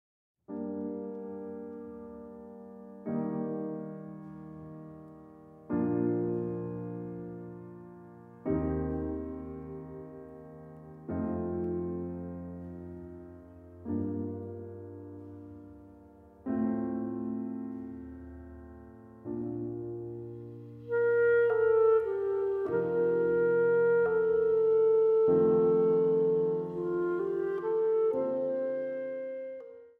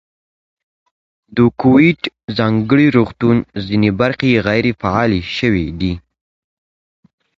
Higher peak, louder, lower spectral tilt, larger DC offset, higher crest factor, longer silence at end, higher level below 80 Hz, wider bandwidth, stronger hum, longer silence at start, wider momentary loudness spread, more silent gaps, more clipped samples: second, -16 dBFS vs 0 dBFS; second, -30 LUFS vs -15 LUFS; first, -11 dB/octave vs -8 dB/octave; neither; about the same, 16 dB vs 16 dB; second, 0.1 s vs 1.4 s; second, -58 dBFS vs -40 dBFS; second, 3.5 kHz vs 7.4 kHz; neither; second, 0.5 s vs 1.3 s; first, 23 LU vs 10 LU; second, none vs 2.24-2.28 s; neither